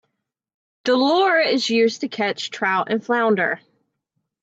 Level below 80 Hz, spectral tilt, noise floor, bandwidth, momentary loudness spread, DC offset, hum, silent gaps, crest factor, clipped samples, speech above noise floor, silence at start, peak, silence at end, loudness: -74 dBFS; -4 dB/octave; -76 dBFS; 8 kHz; 7 LU; under 0.1%; none; none; 14 dB; under 0.1%; 57 dB; 0.85 s; -6 dBFS; 0.85 s; -20 LUFS